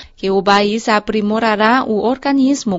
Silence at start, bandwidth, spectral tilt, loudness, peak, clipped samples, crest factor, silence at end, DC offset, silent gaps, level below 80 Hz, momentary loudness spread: 0 s; 7.8 kHz; -5 dB/octave; -14 LUFS; 0 dBFS; under 0.1%; 14 dB; 0 s; under 0.1%; none; -48 dBFS; 4 LU